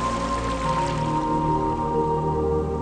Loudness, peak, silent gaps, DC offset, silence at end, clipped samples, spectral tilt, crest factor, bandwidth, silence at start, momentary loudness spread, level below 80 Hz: -24 LUFS; -12 dBFS; none; under 0.1%; 0 s; under 0.1%; -6.5 dB/octave; 12 dB; 10.5 kHz; 0 s; 2 LU; -36 dBFS